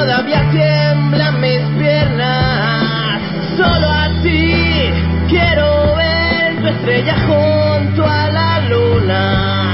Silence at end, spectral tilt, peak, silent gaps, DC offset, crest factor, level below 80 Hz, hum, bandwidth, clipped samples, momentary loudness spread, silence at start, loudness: 0 s; -10.5 dB/octave; -2 dBFS; none; 0.8%; 10 dB; -24 dBFS; none; 5.8 kHz; under 0.1%; 3 LU; 0 s; -13 LUFS